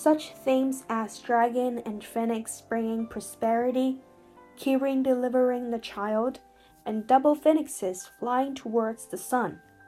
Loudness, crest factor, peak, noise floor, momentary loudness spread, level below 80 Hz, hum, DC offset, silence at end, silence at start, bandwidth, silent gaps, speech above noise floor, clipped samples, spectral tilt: -28 LUFS; 18 dB; -10 dBFS; -53 dBFS; 10 LU; -68 dBFS; none; under 0.1%; 0.3 s; 0 s; 15.5 kHz; none; 27 dB; under 0.1%; -4.5 dB/octave